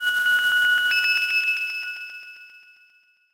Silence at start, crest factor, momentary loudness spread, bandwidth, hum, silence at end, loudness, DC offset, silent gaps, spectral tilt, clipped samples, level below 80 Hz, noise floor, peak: 0 s; 14 dB; 17 LU; 16 kHz; none; 0.75 s; -20 LUFS; under 0.1%; none; 2.5 dB/octave; under 0.1%; -70 dBFS; -59 dBFS; -10 dBFS